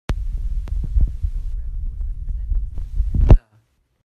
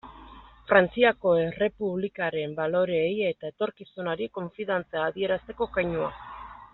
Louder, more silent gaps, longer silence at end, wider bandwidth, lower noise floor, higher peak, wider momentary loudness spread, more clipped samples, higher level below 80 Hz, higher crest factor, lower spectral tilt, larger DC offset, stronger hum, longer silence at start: first, -24 LUFS vs -27 LUFS; neither; first, 0.65 s vs 0.1 s; about the same, 4.5 kHz vs 4.2 kHz; first, -60 dBFS vs -49 dBFS; first, 0 dBFS vs -4 dBFS; about the same, 15 LU vs 13 LU; neither; first, -20 dBFS vs -56 dBFS; about the same, 20 dB vs 24 dB; first, -9 dB/octave vs -3.5 dB/octave; neither; neither; about the same, 0.1 s vs 0.05 s